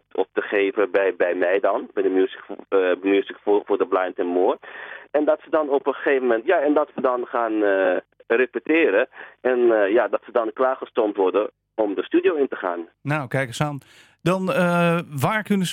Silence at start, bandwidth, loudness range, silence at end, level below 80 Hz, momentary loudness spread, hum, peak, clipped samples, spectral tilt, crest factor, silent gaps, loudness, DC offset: 0.15 s; 16.5 kHz; 3 LU; 0 s; -68 dBFS; 8 LU; none; -6 dBFS; under 0.1%; -6.5 dB/octave; 16 dB; none; -22 LUFS; under 0.1%